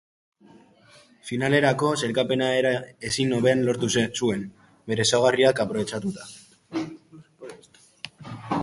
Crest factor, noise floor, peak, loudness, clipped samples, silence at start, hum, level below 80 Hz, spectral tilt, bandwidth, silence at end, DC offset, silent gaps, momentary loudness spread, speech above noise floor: 20 dB; -54 dBFS; -6 dBFS; -24 LUFS; under 0.1%; 1.25 s; none; -60 dBFS; -4.5 dB/octave; 11.5 kHz; 0 s; under 0.1%; none; 21 LU; 32 dB